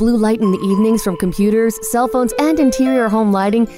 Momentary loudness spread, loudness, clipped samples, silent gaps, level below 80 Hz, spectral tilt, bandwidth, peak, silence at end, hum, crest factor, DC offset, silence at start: 3 LU; -15 LUFS; under 0.1%; none; -38 dBFS; -6 dB/octave; 16 kHz; 0 dBFS; 0 s; none; 14 dB; under 0.1%; 0 s